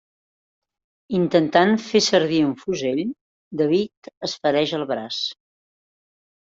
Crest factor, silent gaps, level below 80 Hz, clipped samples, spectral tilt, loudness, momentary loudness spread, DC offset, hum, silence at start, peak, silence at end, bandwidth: 20 dB; 3.21-3.51 s, 3.97-4.02 s, 4.17-4.21 s; -64 dBFS; under 0.1%; -4.5 dB/octave; -21 LUFS; 13 LU; under 0.1%; none; 1.1 s; -4 dBFS; 1.1 s; 7.8 kHz